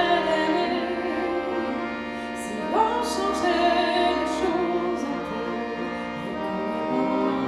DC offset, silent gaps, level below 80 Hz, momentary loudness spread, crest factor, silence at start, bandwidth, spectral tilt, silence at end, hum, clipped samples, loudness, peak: under 0.1%; none; -52 dBFS; 9 LU; 16 dB; 0 s; 13.5 kHz; -4.5 dB/octave; 0 s; none; under 0.1%; -25 LUFS; -8 dBFS